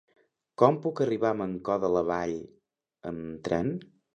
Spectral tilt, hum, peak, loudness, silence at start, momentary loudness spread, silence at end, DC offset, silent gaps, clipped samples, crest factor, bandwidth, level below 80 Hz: -7.5 dB/octave; none; -4 dBFS; -28 LUFS; 0.6 s; 15 LU; 0.3 s; under 0.1%; none; under 0.1%; 24 dB; 8.8 kHz; -60 dBFS